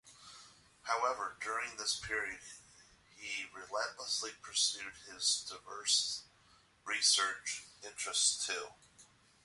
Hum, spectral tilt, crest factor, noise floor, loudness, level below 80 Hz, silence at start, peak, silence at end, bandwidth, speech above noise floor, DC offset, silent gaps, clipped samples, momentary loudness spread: none; 1.5 dB/octave; 22 dB; -67 dBFS; -35 LUFS; -72 dBFS; 0.05 s; -16 dBFS; 0.4 s; 12 kHz; 30 dB; under 0.1%; none; under 0.1%; 19 LU